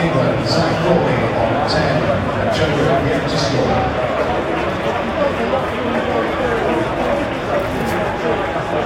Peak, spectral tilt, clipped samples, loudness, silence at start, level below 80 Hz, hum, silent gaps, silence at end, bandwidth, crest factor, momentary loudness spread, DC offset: 0 dBFS; -6 dB/octave; under 0.1%; -17 LUFS; 0 s; -36 dBFS; none; none; 0 s; 16 kHz; 16 dB; 4 LU; under 0.1%